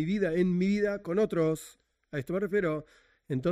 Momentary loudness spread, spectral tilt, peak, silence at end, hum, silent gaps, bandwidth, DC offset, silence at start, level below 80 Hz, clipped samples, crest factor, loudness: 11 LU; -7.5 dB/octave; -16 dBFS; 0 s; none; none; 15.5 kHz; under 0.1%; 0 s; -58 dBFS; under 0.1%; 14 dB; -30 LUFS